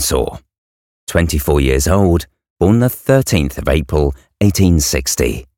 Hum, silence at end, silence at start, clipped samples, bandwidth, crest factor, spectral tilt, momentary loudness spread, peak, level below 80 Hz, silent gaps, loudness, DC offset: none; 0.15 s; 0 s; under 0.1%; 18 kHz; 14 dB; -5 dB/octave; 6 LU; 0 dBFS; -24 dBFS; 0.58-1.07 s, 2.50-2.56 s; -15 LUFS; 0.2%